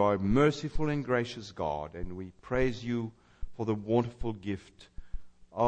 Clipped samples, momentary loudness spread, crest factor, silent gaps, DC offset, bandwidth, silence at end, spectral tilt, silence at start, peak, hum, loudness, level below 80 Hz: under 0.1%; 23 LU; 18 dB; none; under 0.1%; 8.8 kHz; 0 s; -7 dB/octave; 0 s; -12 dBFS; none; -32 LUFS; -44 dBFS